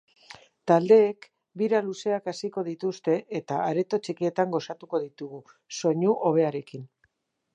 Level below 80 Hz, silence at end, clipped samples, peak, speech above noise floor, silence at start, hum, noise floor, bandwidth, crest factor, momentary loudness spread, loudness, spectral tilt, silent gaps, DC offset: -80 dBFS; 0.7 s; under 0.1%; -6 dBFS; 47 dB; 0.3 s; none; -72 dBFS; 9.2 kHz; 20 dB; 19 LU; -26 LUFS; -6 dB/octave; none; under 0.1%